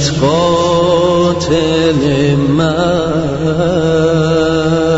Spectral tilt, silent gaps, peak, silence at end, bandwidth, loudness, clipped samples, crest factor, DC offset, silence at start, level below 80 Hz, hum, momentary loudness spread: -6 dB/octave; none; 0 dBFS; 0 s; 8 kHz; -12 LUFS; under 0.1%; 12 dB; under 0.1%; 0 s; -36 dBFS; none; 3 LU